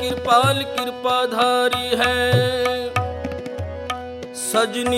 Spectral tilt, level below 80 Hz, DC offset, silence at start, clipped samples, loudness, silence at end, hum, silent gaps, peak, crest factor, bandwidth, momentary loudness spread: -4 dB/octave; -44 dBFS; under 0.1%; 0 s; under 0.1%; -20 LUFS; 0 s; none; none; -4 dBFS; 16 dB; 16.5 kHz; 12 LU